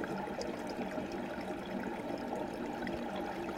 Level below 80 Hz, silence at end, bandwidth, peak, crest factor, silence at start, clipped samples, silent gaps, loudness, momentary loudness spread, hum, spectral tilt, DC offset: -60 dBFS; 0 s; 16.5 kHz; -26 dBFS; 14 dB; 0 s; under 0.1%; none; -40 LUFS; 1 LU; none; -5.5 dB/octave; under 0.1%